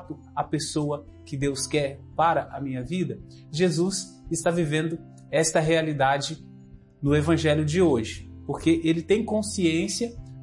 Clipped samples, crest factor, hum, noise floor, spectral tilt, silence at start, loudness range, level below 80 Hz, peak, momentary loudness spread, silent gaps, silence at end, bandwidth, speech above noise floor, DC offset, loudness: under 0.1%; 16 dB; none; -48 dBFS; -5 dB/octave; 0 s; 4 LU; -50 dBFS; -10 dBFS; 12 LU; none; 0 s; 11.5 kHz; 24 dB; under 0.1%; -25 LUFS